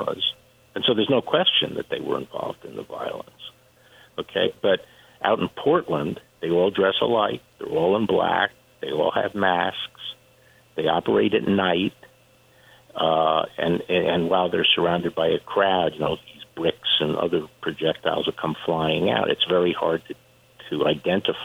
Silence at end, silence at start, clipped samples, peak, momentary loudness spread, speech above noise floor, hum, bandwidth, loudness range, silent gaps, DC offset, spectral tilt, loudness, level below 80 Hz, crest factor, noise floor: 0 s; 0 s; under 0.1%; -6 dBFS; 13 LU; 33 dB; none; 15.5 kHz; 4 LU; none; under 0.1%; -6.5 dB/octave; -23 LUFS; -58 dBFS; 18 dB; -56 dBFS